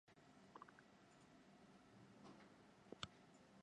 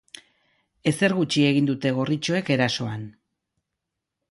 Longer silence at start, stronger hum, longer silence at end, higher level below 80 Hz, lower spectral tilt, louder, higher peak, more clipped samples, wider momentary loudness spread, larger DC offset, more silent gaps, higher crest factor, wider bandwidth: second, 0.05 s vs 0.85 s; neither; second, 0 s vs 1.2 s; second, -84 dBFS vs -64 dBFS; second, -4 dB/octave vs -5.5 dB/octave; second, -63 LUFS vs -23 LUFS; second, -32 dBFS vs -6 dBFS; neither; about the same, 12 LU vs 10 LU; neither; neither; first, 34 dB vs 18 dB; about the same, 10.5 kHz vs 11.5 kHz